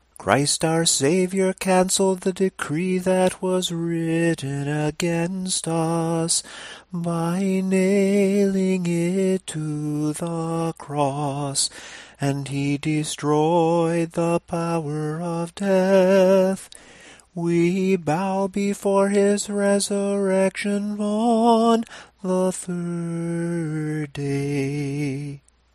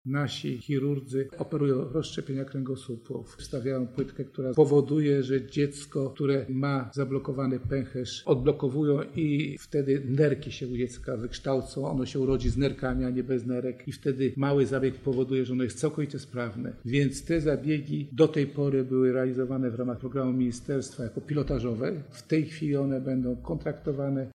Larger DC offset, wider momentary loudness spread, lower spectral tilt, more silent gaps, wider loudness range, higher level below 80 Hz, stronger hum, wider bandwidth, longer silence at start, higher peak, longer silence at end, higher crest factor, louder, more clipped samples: neither; about the same, 9 LU vs 9 LU; second, -5 dB/octave vs -7 dB/octave; neither; about the same, 4 LU vs 3 LU; second, -58 dBFS vs -48 dBFS; neither; first, 15.5 kHz vs 11.5 kHz; first, 0.2 s vs 0.05 s; first, 0 dBFS vs -8 dBFS; first, 0.35 s vs 0.05 s; about the same, 22 dB vs 20 dB; first, -22 LUFS vs -29 LUFS; neither